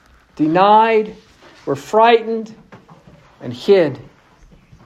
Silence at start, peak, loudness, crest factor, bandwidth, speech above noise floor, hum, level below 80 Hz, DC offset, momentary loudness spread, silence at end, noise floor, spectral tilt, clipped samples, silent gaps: 0.4 s; 0 dBFS; -15 LUFS; 16 dB; 12.5 kHz; 33 dB; none; -56 dBFS; under 0.1%; 21 LU; 0.85 s; -48 dBFS; -6 dB/octave; under 0.1%; none